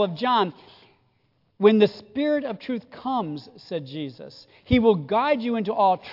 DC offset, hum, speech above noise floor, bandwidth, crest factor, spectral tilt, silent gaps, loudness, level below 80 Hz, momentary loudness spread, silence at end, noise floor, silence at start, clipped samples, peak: under 0.1%; none; 44 dB; 5.8 kHz; 18 dB; -8 dB/octave; none; -23 LUFS; -50 dBFS; 15 LU; 0 s; -67 dBFS; 0 s; under 0.1%; -4 dBFS